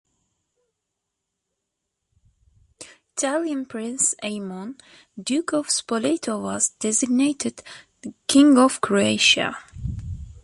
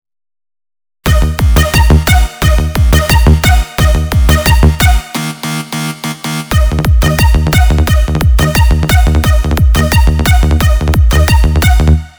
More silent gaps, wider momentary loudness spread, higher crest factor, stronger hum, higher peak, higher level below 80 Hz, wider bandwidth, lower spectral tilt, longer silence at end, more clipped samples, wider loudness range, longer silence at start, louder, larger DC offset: neither; first, 18 LU vs 9 LU; first, 20 dB vs 8 dB; neither; second, -4 dBFS vs 0 dBFS; second, -48 dBFS vs -10 dBFS; second, 11.5 kHz vs over 20 kHz; second, -3 dB/octave vs -5 dB/octave; about the same, 0.05 s vs 0.1 s; second, under 0.1% vs 1%; first, 12 LU vs 2 LU; first, 2.8 s vs 1.05 s; second, -21 LUFS vs -10 LUFS; neither